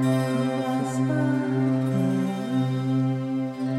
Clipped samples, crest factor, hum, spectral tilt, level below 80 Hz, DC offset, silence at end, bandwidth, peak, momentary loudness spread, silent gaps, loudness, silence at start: under 0.1%; 12 dB; none; -7.5 dB/octave; -68 dBFS; under 0.1%; 0 s; 13 kHz; -12 dBFS; 3 LU; none; -25 LUFS; 0 s